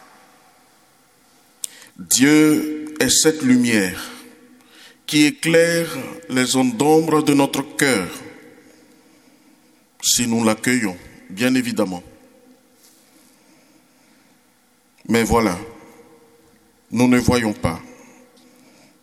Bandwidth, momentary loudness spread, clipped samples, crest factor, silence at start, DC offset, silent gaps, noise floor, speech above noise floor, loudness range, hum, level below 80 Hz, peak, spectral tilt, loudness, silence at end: 16 kHz; 19 LU; under 0.1%; 20 dB; 2 s; under 0.1%; none; -58 dBFS; 41 dB; 8 LU; none; -46 dBFS; 0 dBFS; -3.5 dB/octave; -18 LUFS; 1.1 s